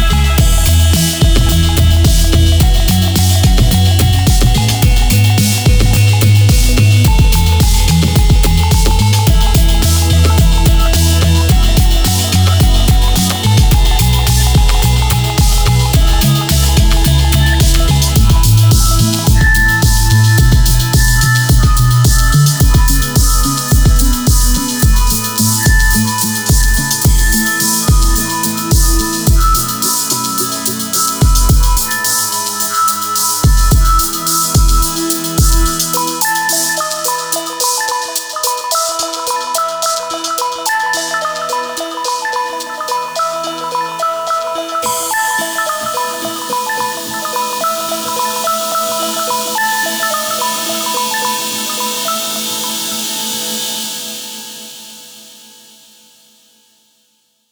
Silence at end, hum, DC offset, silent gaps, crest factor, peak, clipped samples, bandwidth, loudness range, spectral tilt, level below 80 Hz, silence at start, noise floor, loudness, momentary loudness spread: 2.3 s; none; under 0.1%; none; 10 dB; 0 dBFS; under 0.1%; over 20 kHz; 6 LU; -4 dB/octave; -14 dBFS; 0 s; -58 dBFS; -12 LUFS; 7 LU